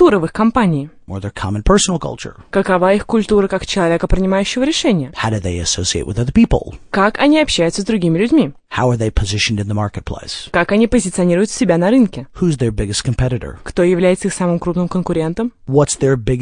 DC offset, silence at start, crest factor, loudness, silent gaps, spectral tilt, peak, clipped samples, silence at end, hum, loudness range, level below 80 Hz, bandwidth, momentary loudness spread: under 0.1%; 0 s; 14 dB; -16 LUFS; none; -5 dB/octave; 0 dBFS; under 0.1%; 0 s; none; 2 LU; -30 dBFS; 10.5 kHz; 9 LU